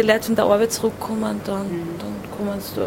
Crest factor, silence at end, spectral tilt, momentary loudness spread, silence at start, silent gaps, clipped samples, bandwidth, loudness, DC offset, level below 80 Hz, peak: 18 dB; 0 s; -4.5 dB/octave; 11 LU; 0 s; none; under 0.1%; 16.5 kHz; -22 LUFS; under 0.1%; -50 dBFS; -4 dBFS